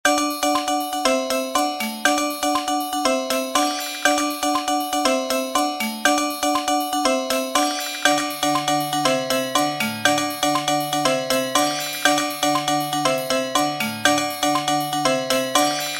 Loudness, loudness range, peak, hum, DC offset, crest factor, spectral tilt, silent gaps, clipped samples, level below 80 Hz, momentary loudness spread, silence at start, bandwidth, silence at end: -20 LUFS; 1 LU; -2 dBFS; none; under 0.1%; 18 dB; -2 dB/octave; none; under 0.1%; -56 dBFS; 3 LU; 0.05 s; 16.5 kHz; 0 s